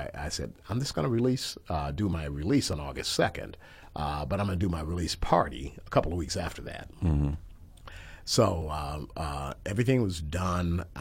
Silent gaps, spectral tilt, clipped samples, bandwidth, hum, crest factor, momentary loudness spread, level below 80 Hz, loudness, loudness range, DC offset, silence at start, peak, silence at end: none; -5.5 dB/octave; under 0.1%; 16.5 kHz; none; 22 dB; 14 LU; -42 dBFS; -30 LUFS; 1 LU; under 0.1%; 0 s; -8 dBFS; 0 s